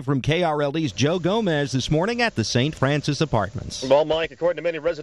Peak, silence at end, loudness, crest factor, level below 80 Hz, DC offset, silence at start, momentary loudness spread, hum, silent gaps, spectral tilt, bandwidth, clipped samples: -6 dBFS; 0 s; -22 LUFS; 16 dB; -46 dBFS; 0.1%; 0 s; 4 LU; none; none; -5.5 dB/octave; 11.5 kHz; under 0.1%